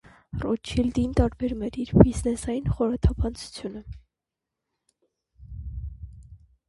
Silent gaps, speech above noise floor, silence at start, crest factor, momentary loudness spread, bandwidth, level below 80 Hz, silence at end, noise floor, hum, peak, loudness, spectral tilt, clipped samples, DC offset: none; 63 dB; 0.35 s; 26 dB; 22 LU; 11.5 kHz; -34 dBFS; 0.35 s; -87 dBFS; none; 0 dBFS; -25 LUFS; -7.5 dB/octave; under 0.1%; under 0.1%